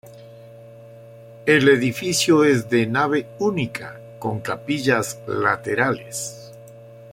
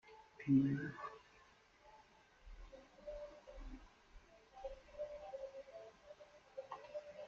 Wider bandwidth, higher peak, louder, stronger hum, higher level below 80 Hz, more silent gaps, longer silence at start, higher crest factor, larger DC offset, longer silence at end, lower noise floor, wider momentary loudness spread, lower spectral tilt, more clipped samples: first, 16.5 kHz vs 7 kHz; first, -2 dBFS vs -24 dBFS; first, -20 LUFS vs -44 LUFS; neither; about the same, -60 dBFS vs -64 dBFS; neither; about the same, 0.05 s vs 0.05 s; second, 18 dB vs 24 dB; neither; about the same, 0 s vs 0 s; second, -43 dBFS vs -68 dBFS; second, 14 LU vs 28 LU; second, -4.5 dB/octave vs -7.5 dB/octave; neither